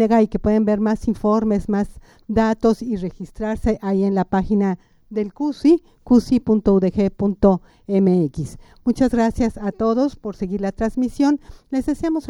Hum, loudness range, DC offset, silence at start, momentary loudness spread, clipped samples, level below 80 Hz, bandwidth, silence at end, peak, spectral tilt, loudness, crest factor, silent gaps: none; 3 LU; under 0.1%; 0 s; 9 LU; under 0.1%; -38 dBFS; 11.5 kHz; 0 s; -2 dBFS; -8 dB/octave; -20 LUFS; 16 dB; none